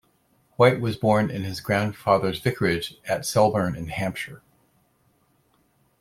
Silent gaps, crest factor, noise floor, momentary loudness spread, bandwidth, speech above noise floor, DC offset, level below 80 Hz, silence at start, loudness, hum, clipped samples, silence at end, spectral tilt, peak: none; 22 dB; -65 dBFS; 10 LU; 16.5 kHz; 42 dB; under 0.1%; -54 dBFS; 0.6 s; -23 LUFS; none; under 0.1%; 1.65 s; -5.5 dB/octave; -4 dBFS